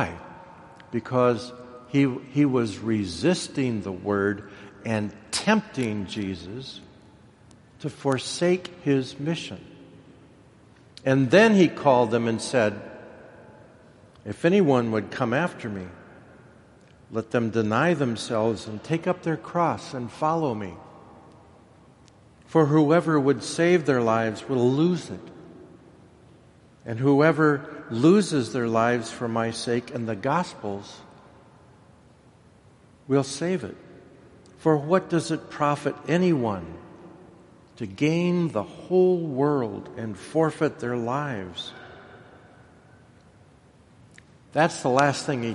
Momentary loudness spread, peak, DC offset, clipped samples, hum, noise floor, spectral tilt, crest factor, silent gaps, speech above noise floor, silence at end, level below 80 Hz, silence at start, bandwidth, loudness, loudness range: 18 LU; -4 dBFS; under 0.1%; under 0.1%; none; -55 dBFS; -6 dB/octave; 22 dB; none; 31 dB; 0 s; -62 dBFS; 0 s; 11.5 kHz; -24 LUFS; 8 LU